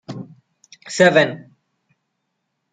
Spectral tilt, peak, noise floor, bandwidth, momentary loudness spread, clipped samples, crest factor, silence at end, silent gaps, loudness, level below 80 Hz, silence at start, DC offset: -4.5 dB/octave; -2 dBFS; -75 dBFS; 9.4 kHz; 22 LU; under 0.1%; 20 dB; 1.3 s; none; -16 LUFS; -66 dBFS; 0.1 s; under 0.1%